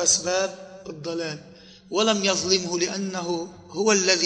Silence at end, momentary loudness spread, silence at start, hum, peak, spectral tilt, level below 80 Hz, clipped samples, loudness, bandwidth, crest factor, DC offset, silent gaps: 0 s; 15 LU; 0 s; none; -6 dBFS; -2 dB/octave; -64 dBFS; under 0.1%; -24 LUFS; 10 kHz; 20 dB; under 0.1%; none